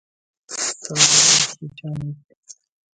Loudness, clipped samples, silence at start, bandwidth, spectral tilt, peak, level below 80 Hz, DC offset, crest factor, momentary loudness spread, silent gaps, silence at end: -15 LUFS; under 0.1%; 0.5 s; 11 kHz; -0.5 dB/octave; 0 dBFS; -60 dBFS; under 0.1%; 22 dB; 21 LU; 2.24-2.29 s, 2.37-2.43 s; 0.45 s